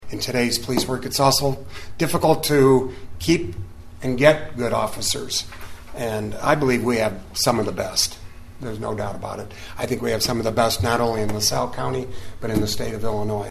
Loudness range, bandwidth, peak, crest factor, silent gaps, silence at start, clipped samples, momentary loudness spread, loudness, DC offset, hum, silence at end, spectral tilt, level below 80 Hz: 4 LU; 14 kHz; 0 dBFS; 22 dB; none; 0 s; under 0.1%; 15 LU; -22 LUFS; under 0.1%; none; 0 s; -4 dB/octave; -42 dBFS